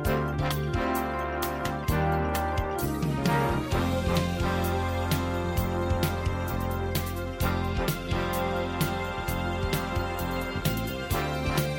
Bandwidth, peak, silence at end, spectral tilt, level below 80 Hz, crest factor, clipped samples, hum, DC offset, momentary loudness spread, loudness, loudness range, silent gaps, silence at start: 17 kHz; -12 dBFS; 0 s; -5.5 dB/octave; -36 dBFS; 14 dB; under 0.1%; none; under 0.1%; 4 LU; -29 LUFS; 2 LU; none; 0 s